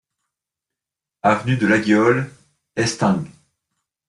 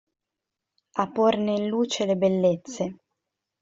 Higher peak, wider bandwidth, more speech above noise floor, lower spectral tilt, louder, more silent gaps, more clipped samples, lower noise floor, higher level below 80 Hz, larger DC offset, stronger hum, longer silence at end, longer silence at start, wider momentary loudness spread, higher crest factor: about the same, -4 dBFS vs -6 dBFS; first, 11.5 kHz vs 7.8 kHz; first, 69 dB vs 62 dB; about the same, -5.5 dB/octave vs -5.5 dB/octave; first, -18 LUFS vs -25 LUFS; neither; neither; about the same, -86 dBFS vs -86 dBFS; first, -56 dBFS vs -68 dBFS; neither; neither; first, 0.8 s vs 0.65 s; first, 1.25 s vs 0.95 s; first, 14 LU vs 10 LU; about the same, 18 dB vs 20 dB